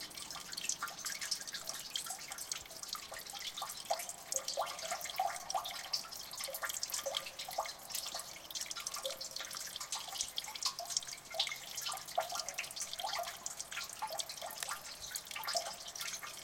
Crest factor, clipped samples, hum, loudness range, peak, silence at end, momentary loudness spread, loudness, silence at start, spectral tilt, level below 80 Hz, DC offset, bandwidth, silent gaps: 28 dB; under 0.1%; none; 2 LU; -14 dBFS; 0 s; 5 LU; -40 LUFS; 0 s; 1 dB/octave; -72 dBFS; under 0.1%; 17 kHz; none